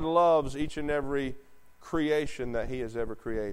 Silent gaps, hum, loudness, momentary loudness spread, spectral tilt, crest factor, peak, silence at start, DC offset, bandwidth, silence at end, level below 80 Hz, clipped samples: none; none; -30 LUFS; 11 LU; -6 dB/octave; 18 dB; -12 dBFS; 0 s; under 0.1%; 15.5 kHz; 0 s; -44 dBFS; under 0.1%